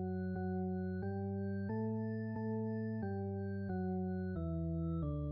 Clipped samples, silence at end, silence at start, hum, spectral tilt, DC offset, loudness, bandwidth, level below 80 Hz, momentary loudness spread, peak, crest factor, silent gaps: under 0.1%; 0 s; 0 s; none; -10.5 dB/octave; under 0.1%; -40 LUFS; 5.2 kHz; -54 dBFS; 2 LU; -30 dBFS; 8 dB; none